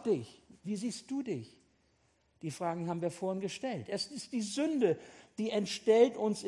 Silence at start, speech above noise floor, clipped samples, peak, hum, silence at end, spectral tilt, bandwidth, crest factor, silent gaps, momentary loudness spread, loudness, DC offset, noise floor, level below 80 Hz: 0 s; 39 dB; under 0.1%; -14 dBFS; none; 0 s; -5 dB/octave; 12 kHz; 22 dB; none; 15 LU; -34 LUFS; under 0.1%; -72 dBFS; -78 dBFS